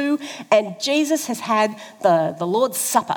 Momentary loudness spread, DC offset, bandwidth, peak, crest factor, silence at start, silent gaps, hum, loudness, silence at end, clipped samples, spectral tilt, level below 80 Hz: 5 LU; under 0.1%; over 20 kHz; -2 dBFS; 18 dB; 0 s; none; none; -20 LUFS; 0 s; under 0.1%; -3.5 dB/octave; -80 dBFS